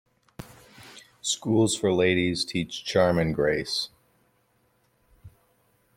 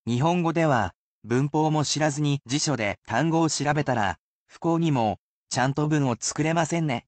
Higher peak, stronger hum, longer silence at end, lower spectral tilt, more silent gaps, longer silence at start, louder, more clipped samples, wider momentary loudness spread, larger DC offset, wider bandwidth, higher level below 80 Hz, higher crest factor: about the same, -8 dBFS vs -10 dBFS; neither; first, 0.7 s vs 0.05 s; about the same, -4.5 dB/octave vs -5 dB/octave; second, none vs 0.95-1.22 s, 2.98-3.02 s, 4.19-4.46 s, 5.18-5.47 s; first, 0.4 s vs 0.05 s; about the same, -25 LUFS vs -25 LUFS; neither; first, 24 LU vs 5 LU; neither; first, 16 kHz vs 9 kHz; about the same, -56 dBFS vs -58 dBFS; first, 20 dB vs 14 dB